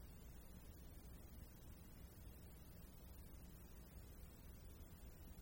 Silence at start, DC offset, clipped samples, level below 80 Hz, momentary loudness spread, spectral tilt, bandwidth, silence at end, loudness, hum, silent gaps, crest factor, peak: 0 s; under 0.1%; under 0.1%; -60 dBFS; 1 LU; -5.5 dB/octave; 16.5 kHz; 0 s; -61 LUFS; none; none; 14 dB; -46 dBFS